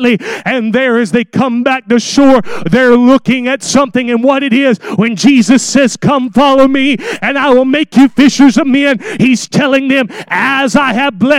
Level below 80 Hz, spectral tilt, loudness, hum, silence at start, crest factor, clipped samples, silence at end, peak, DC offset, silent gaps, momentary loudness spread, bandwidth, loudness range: -44 dBFS; -4.5 dB/octave; -9 LUFS; none; 0 s; 8 dB; 0.5%; 0 s; 0 dBFS; under 0.1%; none; 6 LU; 12 kHz; 1 LU